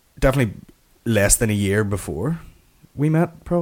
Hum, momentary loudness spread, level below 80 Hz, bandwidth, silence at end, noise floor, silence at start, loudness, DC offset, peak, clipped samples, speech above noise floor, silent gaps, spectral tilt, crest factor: none; 11 LU; -34 dBFS; 17 kHz; 0 s; -49 dBFS; 0.2 s; -20 LUFS; under 0.1%; 0 dBFS; under 0.1%; 29 dB; none; -5 dB/octave; 20 dB